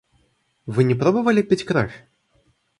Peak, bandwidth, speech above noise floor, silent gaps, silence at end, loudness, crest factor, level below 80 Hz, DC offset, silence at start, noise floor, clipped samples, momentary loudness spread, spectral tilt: -4 dBFS; 11 kHz; 46 dB; none; 0.85 s; -20 LUFS; 18 dB; -54 dBFS; under 0.1%; 0.65 s; -65 dBFS; under 0.1%; 10 LU; -7.5 dB/octave